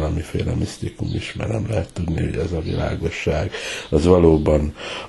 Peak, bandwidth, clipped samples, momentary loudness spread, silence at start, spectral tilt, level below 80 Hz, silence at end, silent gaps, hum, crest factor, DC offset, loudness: -2 dBFS; 12 kHz; under 0.1%; 12 LU; 0 s; -6.5 dB/octave; -32 dBFS; 0 s; none; none; 20 dB; under 0.1%; -21 LUFS